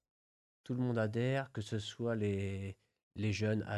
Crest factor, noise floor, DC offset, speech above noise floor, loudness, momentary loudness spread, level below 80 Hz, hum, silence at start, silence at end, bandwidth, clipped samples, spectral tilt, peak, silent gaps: 14 dB; under -90 dBFS; under 0.1%; over 54 dB; -37 LUFS; 10 LU; -60 dBFS; none; 0.65 s; 0 s; 11.5 kHz; under 0.1%; -6.5 dB/octave; -24 dBFS; 3.03-3.11 s